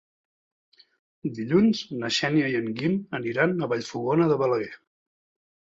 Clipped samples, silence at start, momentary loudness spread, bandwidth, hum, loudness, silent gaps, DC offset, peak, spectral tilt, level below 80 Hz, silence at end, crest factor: under 0.1%; 1.25 s; 9 LU; 8 kHz; none; -25 LUFS; none; under 0.1%; -6 dBFS; -6 dB/octave; -66 dBFS; 1 s; 20 dB